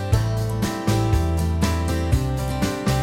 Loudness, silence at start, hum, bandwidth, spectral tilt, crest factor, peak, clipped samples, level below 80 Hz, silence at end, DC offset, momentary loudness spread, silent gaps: -22 LUFS; 0 s; none; 16.5 kHz; -6 dB/octave; 14 dB; -6 dBFS; under 0.1%; -28 dBFS; 0 s; under 0.1%; 3 LU; none